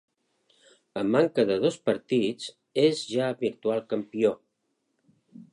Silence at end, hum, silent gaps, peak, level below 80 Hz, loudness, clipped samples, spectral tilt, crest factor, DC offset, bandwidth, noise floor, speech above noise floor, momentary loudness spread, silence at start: 0.1 s; none; none; -8 dBFS; -72 dBFS; -26 LUFS; under 0.1%; -5.5 dB/octave; 18 dB; under 0.1%; 11 kHz; -77 dBFS; 51 dB; 8 LU; 0.95 s